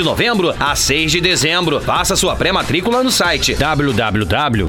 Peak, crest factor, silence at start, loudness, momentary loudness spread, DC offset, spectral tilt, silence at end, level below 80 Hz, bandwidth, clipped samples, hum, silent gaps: 0 dBFS; 14 dB; 0 s; -14 LUFS; 3 LU; under 0.1%; -3.5 dB/octave; 0 s; -32 dBFS; 18 kHz; under 0.1%; none; none